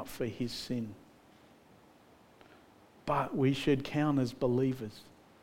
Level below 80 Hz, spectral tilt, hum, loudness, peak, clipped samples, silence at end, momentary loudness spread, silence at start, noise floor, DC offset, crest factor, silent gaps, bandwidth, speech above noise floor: -60 dBFS; -6.5 dB/octave; none; -33 LUFS; -16 dBFS; under 0.1%; 0.35 s; 14 LU; 0 s; -61 dBFS; under 0.1%; 18 dB; none; 16.5 kHz; 29 dB